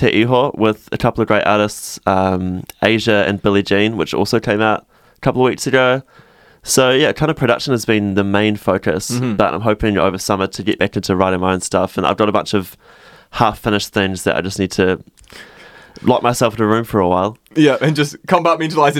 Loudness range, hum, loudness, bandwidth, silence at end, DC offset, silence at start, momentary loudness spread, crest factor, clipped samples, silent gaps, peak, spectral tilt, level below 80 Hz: 2 LU; none; -16 LUFS; 17 kHz; 0 s; under 0.1%; 0 s; 6 LU; 16 dB; under 0.1%; none; 0 dBFS; -5 dB/octave; -44 dBFS